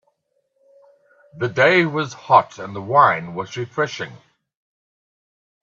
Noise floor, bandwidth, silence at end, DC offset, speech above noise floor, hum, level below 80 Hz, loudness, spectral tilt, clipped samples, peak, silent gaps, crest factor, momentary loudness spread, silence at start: -70 dBFS; 7.6 kHz; 1.65 s; under 0.1%; 51 dB; none; -68 dBFS; -18 LUFS; -5.5 dB/octave; under 0.1%; 0 dBFS; none; 22 dB; 16 LU; 1.35 s